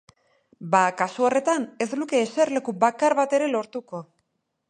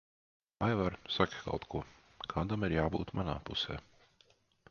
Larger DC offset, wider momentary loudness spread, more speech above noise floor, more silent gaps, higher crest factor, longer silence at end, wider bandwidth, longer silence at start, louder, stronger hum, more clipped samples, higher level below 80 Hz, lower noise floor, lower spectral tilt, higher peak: neither; first, 14 LU vs 10 LU; first, 52 dB vs 34 dB; neither; second, 20 dB vs 26 dB; second, 0.65 s vs 0.9 s; first, 10.5 kHz vs 7 kHz; about the same, 0.6 s vs 0.6 s; first, -23 LUFS vs -36 LUFS; neither; neither; second, -76 dBFS vs -52 dBFS; first, -75 dBFS vs -69 dBFS; about the same, -4.5 dB/octave vs -4.5 dB/octave; first, -4 dBFS vs -12 dBFS